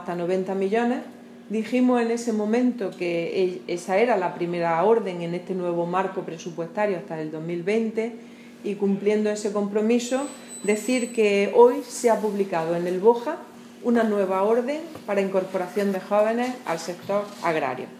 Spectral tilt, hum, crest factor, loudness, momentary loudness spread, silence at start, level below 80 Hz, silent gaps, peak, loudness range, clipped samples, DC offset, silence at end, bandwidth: -5.5 dB/octave; none; 20 dB; -24 LUFS; 10 LU; 0 s; -78 dBFS; none; -4 dBFS; 5 LU; under 0.1%; under 0.1%; 0 s; 15 kHz